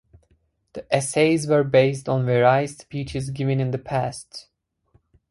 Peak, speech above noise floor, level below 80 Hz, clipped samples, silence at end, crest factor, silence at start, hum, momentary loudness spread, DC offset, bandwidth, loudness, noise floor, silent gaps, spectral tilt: -4 dBFS; 43 dB; -54 dBFS; under 0.1%; 0.9 s; 18 dB; 0.75 s; none; 19 LU; under 0.1%; 11.5 kHz; -22 LUFS; -65 dBFS; none; -6 dB/octave